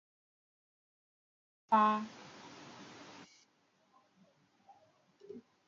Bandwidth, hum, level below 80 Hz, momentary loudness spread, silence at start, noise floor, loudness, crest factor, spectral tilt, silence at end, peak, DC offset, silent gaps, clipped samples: 7.4 kHz; none; -88 dBFS; 25 LU; 1.7 s; -74 dBFS; -32 LUFS; 24 dB; -3.5 dB/octave; 0.3 s; -18 dBFS; under 0.1%; none; under 0.1%